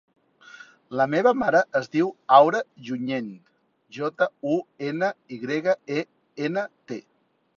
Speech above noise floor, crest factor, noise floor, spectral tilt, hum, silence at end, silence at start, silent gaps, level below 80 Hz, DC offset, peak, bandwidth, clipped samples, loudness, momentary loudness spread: 25 dB; 24 dB; -49 dBFS; -6 dB/octave; none; 0.6 s; 0.55 s; none; -70 dBFS; under 0.1%; -2 dBFS; 7.2 kHz; under 0.1%; -24 LUFS; 18 LU